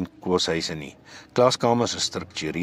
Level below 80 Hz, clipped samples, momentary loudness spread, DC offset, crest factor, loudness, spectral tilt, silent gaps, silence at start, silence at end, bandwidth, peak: -58 dBFS; under 0.1%; 11 LU; under 0.1%; 20 dB; -24 LUFS; -4 dB/octave; none; 0 s; 0 s; 15.5 kHz; -4 dBFS